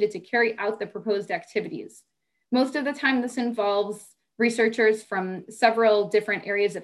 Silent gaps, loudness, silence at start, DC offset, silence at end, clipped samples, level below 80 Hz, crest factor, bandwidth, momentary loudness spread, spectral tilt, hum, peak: none; -24 LUFS; 0 s; under 0.1%; 0 s; under 0.1%; -74 dBFS; 20 dB; 12 kHz; 11 LU; -4.5 dB/octave; none; -6 dBFS